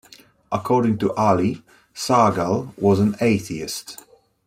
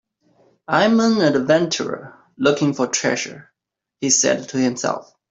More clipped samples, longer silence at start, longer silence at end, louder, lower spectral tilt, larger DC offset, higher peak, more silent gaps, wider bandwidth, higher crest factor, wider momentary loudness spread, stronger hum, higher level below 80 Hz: neither; second, 0.5 s vs 0.7 s; first, 0.5 s vs 0.3 s; about the same, -20 LUFS vs -18 LUFS; first, -6 dB/octave vs -3.5 dB/octave; neither; about the same, -4 dBFS vs -2 dBFS; neither; first, 16 kHz vs 8 kHz; about the same, 18 dB vs 18 dB; first, 15 LU vs 11 LU; neither; first, -56 dBFS vs -62 dBFS